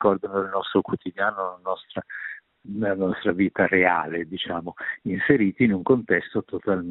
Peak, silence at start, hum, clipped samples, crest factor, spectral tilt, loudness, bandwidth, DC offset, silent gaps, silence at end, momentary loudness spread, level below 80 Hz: -2 dBFS; 0 s; none; under 0.1%; 22 dB; -4.5 dB/octave; -24 LUFS; 4.1 kHz; under 0.1%; none; 0 s; 13 LU; -62 dBFS